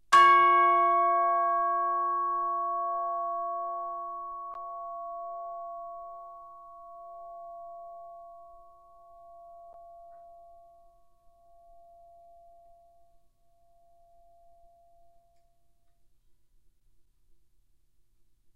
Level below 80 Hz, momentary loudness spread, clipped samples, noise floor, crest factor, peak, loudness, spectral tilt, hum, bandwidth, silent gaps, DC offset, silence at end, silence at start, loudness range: -68 dBFS; 27 LU; under 0.1%; -69 dBFS; 24 dB; -8 dBFS; -27 LUFS; -2.5 dB/octave; none; 11.5 kHz; none; under 0.1%; 8.25 s; 0.1 s; 27 LU